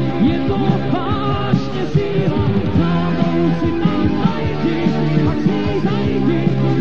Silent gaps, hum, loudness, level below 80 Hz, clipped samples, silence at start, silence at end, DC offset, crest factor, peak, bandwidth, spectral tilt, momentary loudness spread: none; none; -17 LUFS; -36 dBFS; under 0.1%; 0 s; 0 s; 5%; 16 dB; 0 dBFS; 7 kHz; -8.5 dB/octave; 2 LU